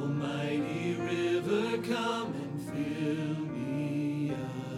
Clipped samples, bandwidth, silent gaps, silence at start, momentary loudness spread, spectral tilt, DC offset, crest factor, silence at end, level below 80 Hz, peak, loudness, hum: under 0.1%; 15 kHz; none; 0 s; 5 LU; -6.5 dB/octave; under 0.1%; 14 dB; 0 s; -68 dBFS; -18 dBFS; -33 LUFS; none